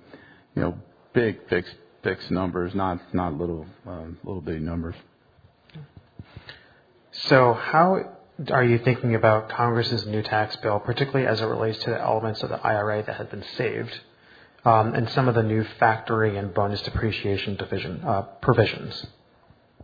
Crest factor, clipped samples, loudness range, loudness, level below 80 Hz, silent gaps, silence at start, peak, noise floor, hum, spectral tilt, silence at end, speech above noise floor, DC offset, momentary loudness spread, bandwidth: 24 dB; under 0.1%; 9 LU; -24 LUFS; -50 dBFS; none; 0.15 s; -2 dBFS; -58 dBFS; none; -8 dB/octave; 0 s; 34 dB; under 0.1%; 17 LU; 5 kHz